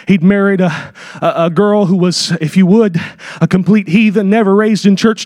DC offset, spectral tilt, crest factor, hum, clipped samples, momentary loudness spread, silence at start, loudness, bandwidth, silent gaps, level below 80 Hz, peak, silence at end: under 0.1%; -6.5 dB/octave; 10 dB; none; under 0.1%; 8 LU; 0.05 s; -11 LUFS; 11.5 kHz; none; -50 dBFS; 0 dBFS; 0 s